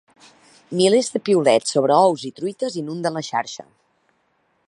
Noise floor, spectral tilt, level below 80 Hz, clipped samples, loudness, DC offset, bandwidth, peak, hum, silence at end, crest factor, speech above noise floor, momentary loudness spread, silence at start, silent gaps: -66 dBFS; -4.5 dB/octave; -72 dBFS; under 0.1%; -20 LUFS; under 0.1%; 11.5 kHz; -2 dBFS; none; 1.05 s; 18 dB; 47 dB; 12 LU; 0.7 s; none